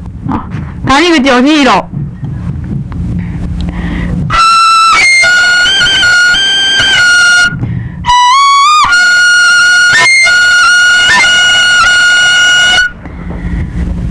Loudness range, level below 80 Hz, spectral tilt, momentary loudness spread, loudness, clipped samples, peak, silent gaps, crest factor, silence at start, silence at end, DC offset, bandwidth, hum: 6 LU; -24 dBFS; -2.5 dB/octave; 14 LU; -4 LUFS; under 0.1%; 0 dBFS; none; 6 dB; 0 s; 0 s; 0.2%; 11 kHz; none